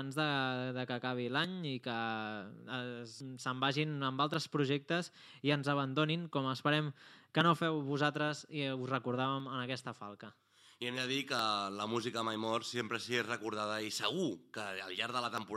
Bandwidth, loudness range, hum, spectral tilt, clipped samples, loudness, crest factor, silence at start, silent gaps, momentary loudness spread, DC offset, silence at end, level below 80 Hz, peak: 14 kHz; 4 LU; none; -5 dB/octave; under 0.1%; -36 LUFS; 24 dB; 0 s; none; 10 LU; under 0.1%; 0 s; under -90 dBFS; -12 dBFS